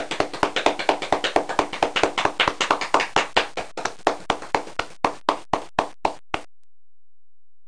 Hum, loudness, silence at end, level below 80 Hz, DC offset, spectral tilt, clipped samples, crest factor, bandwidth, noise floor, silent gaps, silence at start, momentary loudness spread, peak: none; -23 LUFS; 1.25 s; -52 dBFS; 1%; -2.5 dB/octave; under 0.1%; 20 dB; 10.5 kHz; under -90 dBFS; none; 0 s; 8 LU; -4 dBFS